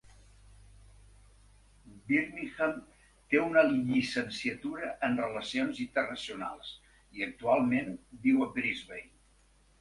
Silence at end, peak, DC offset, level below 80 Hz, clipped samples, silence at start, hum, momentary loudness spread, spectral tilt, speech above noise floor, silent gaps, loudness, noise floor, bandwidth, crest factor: 0.75 s; -12 dBFS; under 0.1%; -62 dBFS; under 0.1%; 1.85 s; none; 15 LU; -5.5 dB/octave; 33 dB; none; -31 LUFS; -64 dBFS; 11.5 kHz; 22 dB